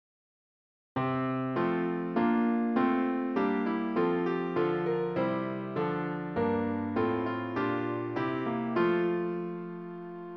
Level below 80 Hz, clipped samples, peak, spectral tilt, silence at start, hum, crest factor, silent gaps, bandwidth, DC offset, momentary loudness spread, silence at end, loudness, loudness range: -68 dBFS; under 0.1%; -14 dBFS; -9.5 dB/octave; 0.95 s; none; 16 dB; none; 5.8 kHz; under 0.1%; 7 LU; 0 s; -30 LUFS; 2 LU